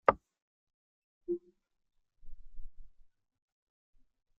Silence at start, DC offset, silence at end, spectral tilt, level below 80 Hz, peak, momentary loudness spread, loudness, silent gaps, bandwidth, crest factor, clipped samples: 0.05 s; under 0.1%; 1.35 s; -4.5 dB/octave; -56 dBFS; -8 dBFS; 24 LU; -38 LUFS; 0.42-0.67 s, 0.74-1.21 s; 5.6 kHz; 32 dB; under 0.1%